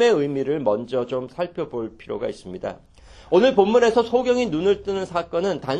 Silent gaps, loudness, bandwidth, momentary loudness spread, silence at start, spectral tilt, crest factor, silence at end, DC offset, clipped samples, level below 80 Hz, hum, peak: none; -22 LUFS; 9.6 kHz; 15 LU; 0 s; -5.5 dB/octave; 18 dB; 0 s; under 0.1%; under 0.1%; -52 dBFS; none; -2 dBFS